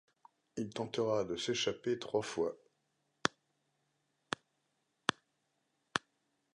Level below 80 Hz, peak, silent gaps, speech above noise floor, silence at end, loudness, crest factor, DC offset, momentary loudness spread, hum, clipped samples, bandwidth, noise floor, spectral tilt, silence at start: -74 dBFS; -10 dBFS; none; 45 dB; 0.55 s; -38 LUFS; 32 dB; under 0.1%; 9 LU; none; under 0.1%; 11 kHz; -81 dBFS; -3.5 dB/octave; 0.55 s